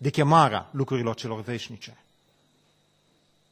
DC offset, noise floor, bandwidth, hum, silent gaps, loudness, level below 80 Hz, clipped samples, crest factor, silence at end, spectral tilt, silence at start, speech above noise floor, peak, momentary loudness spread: under 0.1%; -66 dBFS; 12.5 kHz; 50 Hz at -60 dBFS; none; -24 LUFS; -62 dBFS; under 0.1%; 24 dB; 1.6 s; -6.5 dB/octave; 0 s; 41 dB; -4 dBFS; 21 LU